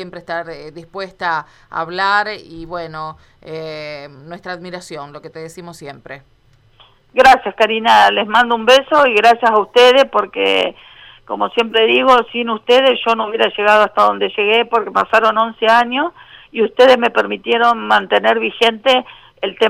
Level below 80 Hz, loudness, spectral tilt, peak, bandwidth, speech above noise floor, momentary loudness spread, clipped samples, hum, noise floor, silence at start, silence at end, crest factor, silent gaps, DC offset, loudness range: -52 dBFS; -13 LUFS; -3.5 dB/octave; -2 dBFS; 15 kHz; 35 dB; 20 LU; under 0.1%; none; -49 dBFS; 0 s; 0 s; 14 dB; none; under 0.1%; 17 LU